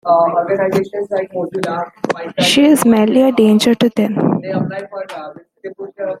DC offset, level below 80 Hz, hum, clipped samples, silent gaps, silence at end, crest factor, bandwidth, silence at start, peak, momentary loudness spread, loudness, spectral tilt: under 0.1%; -58 dBFS; none; under 0.1%; none; 0 s; 14 dB; 16 kHz; 0.05 s; 0 dBFS; 18 LU; -14 LUFS; -5 dB/octave